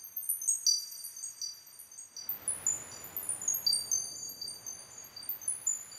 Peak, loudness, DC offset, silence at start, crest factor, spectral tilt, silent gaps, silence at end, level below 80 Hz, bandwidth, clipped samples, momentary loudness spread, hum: -14 dBFS; -33 LUFS; under 0.1%; 0 s; 22 dB; 2 dB/octave; none; 0 s; -76 dBFS; 16 kHz; under 0.1%; 16 LU; none